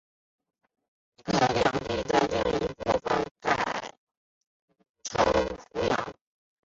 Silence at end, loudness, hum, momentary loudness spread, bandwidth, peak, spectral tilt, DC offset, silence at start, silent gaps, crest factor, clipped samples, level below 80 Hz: 0.5 s; -27 LUFS; none; 11 LU; 8 kHz; -10 dBFS; -4.5 dB/octave; under 0.1%; 1.25 s; 3.31-3.35 s, 3.98-4.07 s, 4.17-4.41 s, 4.47-4.68 s, 4.89-4.94 s; 20 dB; under 0.1%; -50 dBFS